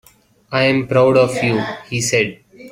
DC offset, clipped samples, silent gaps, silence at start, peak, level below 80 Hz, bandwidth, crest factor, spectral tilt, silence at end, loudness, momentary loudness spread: under 0.1%; under 0.1%; none; 0.5 s; -2 dBFS; -52 dBFS; 16 kHz; 16 dB; -4.5 dB/octave; 0 s; -16 LUFS; 10 LU